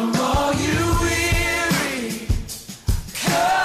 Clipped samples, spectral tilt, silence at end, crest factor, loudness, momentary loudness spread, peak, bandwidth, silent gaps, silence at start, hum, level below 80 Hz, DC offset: under 0.1%; -4 dB/octave; 0 s; 10 dB; -21 LUFS; 8 LU; -10 dBFS; 15 kHz; none; 0 s; none; -30 dBFS; under 0.1%